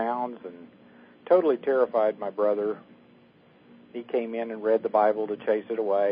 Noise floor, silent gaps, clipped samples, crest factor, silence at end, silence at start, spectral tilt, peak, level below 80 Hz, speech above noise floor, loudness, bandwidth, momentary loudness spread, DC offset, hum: -57 dBFS; none; under 0.1%; 18 dB; 0 s; 0 s; -10 dB/octave; -8 dBFS; -80 dBFS; 31 dB; -26 LUFS; 5.2 kHz; 15 LU; under 0.1%; none